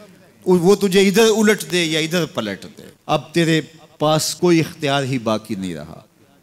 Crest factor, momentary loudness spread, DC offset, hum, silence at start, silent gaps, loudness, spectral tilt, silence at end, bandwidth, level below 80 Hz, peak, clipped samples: 14 dB; 14 LU; under 0.1%; none; 0 s; none; -18 LUFS; -4.5 dB/octave; 0.4 s; 16.5 kHz; -56 dBFS; -4 dBFS; under 0.1%